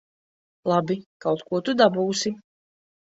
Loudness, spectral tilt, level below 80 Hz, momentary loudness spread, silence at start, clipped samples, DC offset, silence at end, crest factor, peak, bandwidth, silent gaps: -24 LUFS; -4.5 dB/octave; -68 dBFS; 10 LU; 0.65 s; under 0.1%; under 0.1%; 0.7 s; 20 dB; -4 dBFS; 8 kHz; 1.06-1.20 s